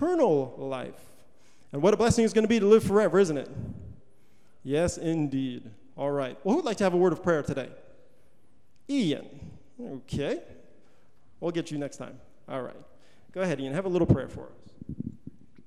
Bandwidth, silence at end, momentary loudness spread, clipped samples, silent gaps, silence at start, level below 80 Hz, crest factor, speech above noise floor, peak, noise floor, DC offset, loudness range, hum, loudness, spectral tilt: 14 kHz; 0.55 s; 21 LU; under 0.1%; none; 0 s; -54 dBFS; 20 dB; 40 dB; -8 dBFS; -66 dBFS; 0.4%; 11 LU; none; -27 LUFS; -6.5 dB/octave